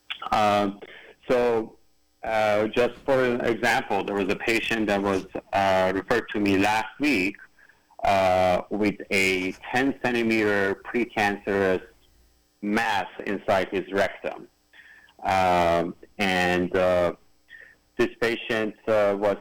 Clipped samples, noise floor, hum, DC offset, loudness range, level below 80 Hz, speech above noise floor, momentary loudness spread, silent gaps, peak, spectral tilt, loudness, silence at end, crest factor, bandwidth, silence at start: under 0.1%; -61 dBFS; none; under 0.1%; 3 LU; -54 dBFS; 37 dB; 8 LU; none; -12 dBFS; -5 dB/octave; -24 LUFS; 0 s; 12 dB; 19.5 kHz; 0.1 s